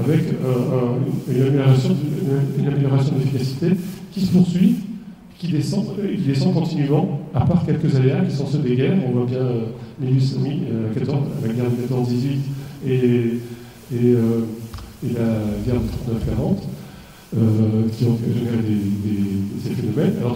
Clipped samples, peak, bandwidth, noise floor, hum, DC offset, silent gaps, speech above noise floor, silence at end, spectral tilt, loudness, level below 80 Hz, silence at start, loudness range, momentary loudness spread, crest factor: under 0.1%; -4 dBFS; 16 kHz; -40 dBFS; none; under 0.1%; none; 21 dB; 0 s; -8.5 dB/octave; -20 LUFS; -44 dBFS; 0 s; 3 LU; 11 LU; 16 dB